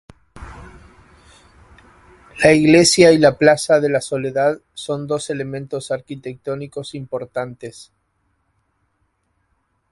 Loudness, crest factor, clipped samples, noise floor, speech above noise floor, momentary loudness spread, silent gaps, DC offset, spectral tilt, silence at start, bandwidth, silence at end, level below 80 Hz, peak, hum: -16 LUFS; 20 dB; under 0.1%; -67 dBFS; 50 dB; 20 LU; none; under 0.1%; -4.5 dB/octave; 0.35 s; 11.5 kHz; 2.1 s; -50 dBFS; 0 dBFS; none